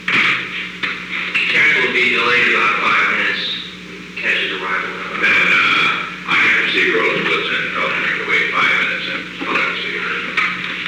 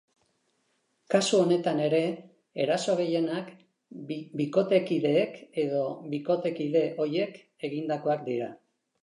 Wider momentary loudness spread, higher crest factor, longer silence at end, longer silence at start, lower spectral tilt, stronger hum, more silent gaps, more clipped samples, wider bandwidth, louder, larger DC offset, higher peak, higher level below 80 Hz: second, 10 LU vs 13 LU; second, 12 dB vs 20 dB; second, 0 s vs 0.45 s; second, 0 s vs 1.1 s; second, -3 dB/octave vs -5.5 dB/octave; neither; neither; neither; first, 15 kHz vs 11 kHz; first, -15 LUFS vs -28 LUFS; neither; first, -4 dBFS vs -8 dBFS; first, -54 dBFS vs -82 dBFS